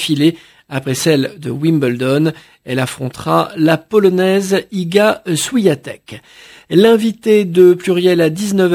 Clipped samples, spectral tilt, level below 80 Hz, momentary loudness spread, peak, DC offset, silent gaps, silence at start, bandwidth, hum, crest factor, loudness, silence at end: under 0.1%; -5.5 dB/octave; -56 dBFS; 11 LU; 0 dBFS; under 0.1%; none; 0 s; 16 kHz; none; 14 dB; -14 LUFS; 0 s